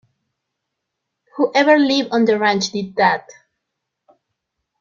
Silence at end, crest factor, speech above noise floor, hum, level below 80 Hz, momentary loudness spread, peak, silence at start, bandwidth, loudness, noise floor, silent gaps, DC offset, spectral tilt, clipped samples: 1.6 s; 18 dB; 62 dB; none; -64 dBFS; 9 LU; -2 dBFS; 1.35 s; 7.4 kHz; -16 LUFS; -79 dBFS; none; under 0.1%; -4 dB/octave; under 0.1%